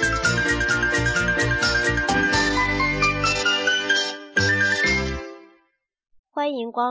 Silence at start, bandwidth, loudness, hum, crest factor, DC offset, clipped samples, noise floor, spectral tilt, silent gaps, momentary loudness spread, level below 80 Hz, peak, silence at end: 0 s; 8 kHz; -20 LUFS; none; 14 dB; under 0.1%; under 0.1%; -68 dBFS; -3.5 dB/octave; 6.19-6.24 s; 7 LU; -36 dBFS; -8 dBFS; 0 s